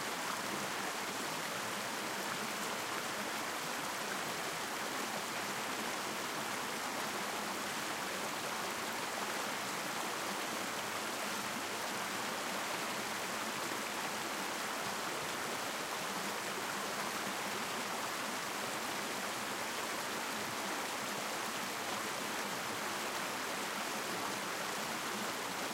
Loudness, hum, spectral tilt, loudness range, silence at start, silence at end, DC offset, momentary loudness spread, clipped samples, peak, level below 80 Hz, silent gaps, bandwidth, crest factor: -38 LUFS; none; -1.5 dB/octave; 0 LU; 0 s; 0 s; under 0.1%; 1 LU; under 0.1%; -24 dBFS; -76 dBFS; none; 16 kHz; 16 dB